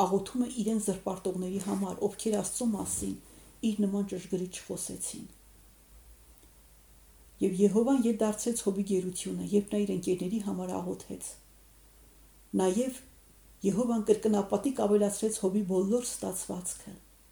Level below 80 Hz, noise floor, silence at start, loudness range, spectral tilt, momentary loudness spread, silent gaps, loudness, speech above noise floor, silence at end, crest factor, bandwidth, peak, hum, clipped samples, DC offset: -60 dBFS; -58 dBFS; 0 s; 7 LU; -5.5 dB/octave; 11 LU; none; -31 LUFS; 28 dB; 0.35 s; 20 dB; over 20 kHz; -12 dBFS; none; under 0.1%; under 0.1%